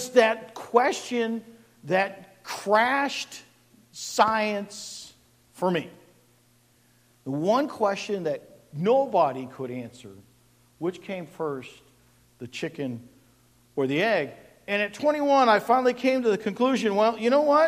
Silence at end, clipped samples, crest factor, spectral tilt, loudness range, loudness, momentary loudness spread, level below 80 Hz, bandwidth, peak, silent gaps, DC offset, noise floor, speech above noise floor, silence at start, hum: 0 s; under 0.1%; 20 dB; -4.5 dB/octave; 12 LU; -25 LUFS; 17 LU; -70 dBFS; 15.5 kHz; -6 dBFS; none; under 0.1%; -62 dBFS; 37 dB; 0 s; none